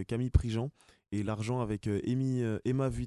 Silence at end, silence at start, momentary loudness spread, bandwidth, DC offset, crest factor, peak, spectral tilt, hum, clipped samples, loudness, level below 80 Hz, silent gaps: 0 s; 0 s; 6 LU; 11.5 kHz; under 0.1%; 22 dB; -10 dBFS; -7.5 dB/octave; none; under 0.1%; -33 LUFS; -40 dBFS; none